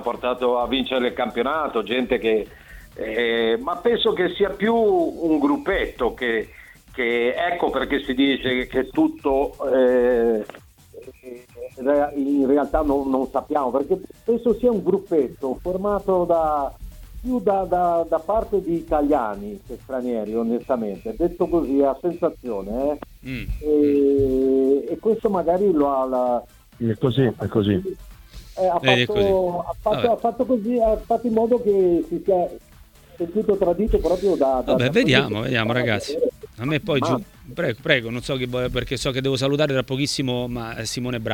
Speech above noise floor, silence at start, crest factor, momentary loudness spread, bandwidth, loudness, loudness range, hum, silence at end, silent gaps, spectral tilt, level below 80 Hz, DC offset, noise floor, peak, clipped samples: 27 dB; 0 s; 22 dB; 9 LU; 18 kHz; -21 LUFS; 3 LU; none; 0 s; none; -6 dB/octave; -42 dBFS; under 0.1%; -48 dBFS; 0 dBFS; under 0.1%